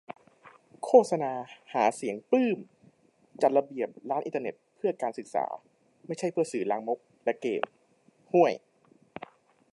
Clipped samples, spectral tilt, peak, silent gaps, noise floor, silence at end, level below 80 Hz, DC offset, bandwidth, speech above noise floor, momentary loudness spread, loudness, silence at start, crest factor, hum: under 0.1%; -5.5 dB/octave; -6 dBFS; none; -65 dBFS; 1.15 s; -84 dBFS; under 0.1%; 11.5 kHz; 37 dB; 18 LU; -29 LUFS; 0.45 s; 24 dB; none